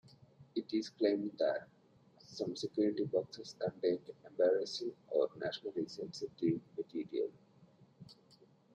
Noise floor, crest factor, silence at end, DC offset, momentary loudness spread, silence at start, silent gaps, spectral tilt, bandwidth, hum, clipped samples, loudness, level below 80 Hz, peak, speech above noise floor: -66 dBFS; 18 dB; 0.6 s; under 0.1%; 10 LU; 0.4 s; none; -5.5 dB/octave; 9.2 kHz; none; under 0.1%; -38 LUFS; -80 dBFS; -20 dBFS; 29 dB